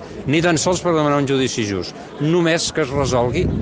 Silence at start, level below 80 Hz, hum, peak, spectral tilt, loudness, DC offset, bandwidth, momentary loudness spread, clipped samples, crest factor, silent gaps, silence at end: 0 s; -38 dBFS; none; -4 dBFS; -5 dB/octave; -18 LUFS; under 0.1%; 10 kHz; 7 LU; under 0.1%; 14 dB; none; 0 s